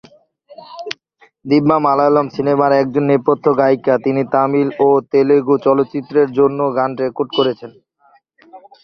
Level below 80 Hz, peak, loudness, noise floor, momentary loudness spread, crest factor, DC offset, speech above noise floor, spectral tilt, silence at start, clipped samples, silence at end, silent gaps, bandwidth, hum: -58 dBFS; 0 dBFS; -15 LUFS; -54 dBFS; 15 LU; 14 dB; under 0.1%; 40 dB; -8 dB/octave; 0.5 s; under 0.1%; 0.25 s; none; 6.2 kHz; none